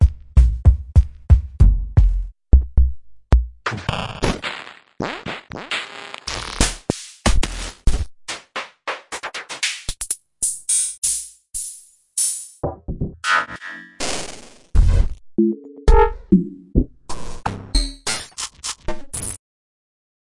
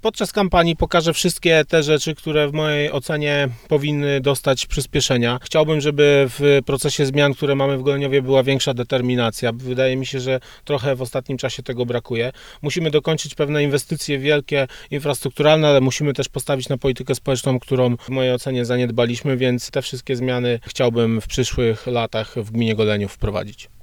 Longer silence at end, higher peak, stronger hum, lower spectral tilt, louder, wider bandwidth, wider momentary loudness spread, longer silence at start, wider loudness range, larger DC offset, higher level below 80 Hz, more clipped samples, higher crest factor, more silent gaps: first, 1 s vs 0.15 s; about the same, 0 dBFS vs 0 dBFS; neither; about the same, -4 dB/octave vs -5 dB/octave; second, -22 LUFS vs -19 LUFS; second, 11.5 kHz vs 18 kHz; first, 13 LU vs 8 LU; about the same, 0 s vs 0.05 s; about the same, 6 LU vs 5 LU; neither; first, -22 dBFS vs -40 dBFS; neither; about the same, 20 dB vs 18 dB; first, 10.98-11.02 s vs none